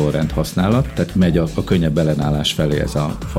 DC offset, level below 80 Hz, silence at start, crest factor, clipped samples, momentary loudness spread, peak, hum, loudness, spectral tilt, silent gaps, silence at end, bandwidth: under 0.1%; -30 dBFS; 0 s; 14 dB; under 0.1%; 4 LU; -4 dBFS; none; -18 LUFS; -6.5 dB/octave; none; 0 s; 16 kHz